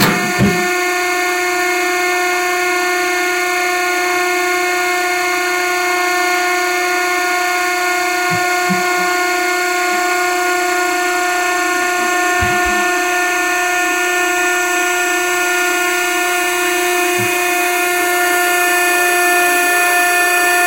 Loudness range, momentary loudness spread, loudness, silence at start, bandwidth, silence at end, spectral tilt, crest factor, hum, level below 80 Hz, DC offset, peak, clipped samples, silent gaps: 2 LU; 3 LU; -14 LUFS; 0 s; 16.5 kHz; 0 s; -2 dB/octave; 14 dB; none; -48 dBFS; 0.1%; 0 dBFS; under 0.1%; none